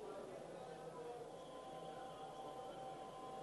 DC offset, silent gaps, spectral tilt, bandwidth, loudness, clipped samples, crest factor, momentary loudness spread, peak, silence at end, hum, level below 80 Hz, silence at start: under 0.1%; none; -5 dB/octave; 11.5 kHz; -52 LUFS; under 0.1%; 12 dB; 2 LU; -40 dBFS; 0 s; none; -78 dBFS; 0 s